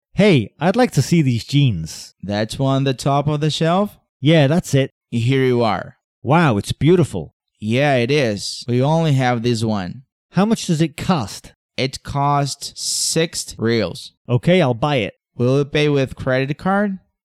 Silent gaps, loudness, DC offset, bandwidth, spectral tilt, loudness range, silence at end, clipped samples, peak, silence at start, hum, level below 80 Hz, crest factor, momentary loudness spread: 4.09-4.20 s, 4.92-5.01 s, 6.04-6.22 s, 7.33-7.40 s, 10.12-10.29 s, 11.56-11.69 s, 14.17-14.25 s; -18 LUFS; under 0.1%; 14 kHz; -5.5 dB/octave; 3 LU; 0.25 s; under 0.1%; -4 dBFS; 0.15 s; none; -48 dBFS; 14 dB; 10 LU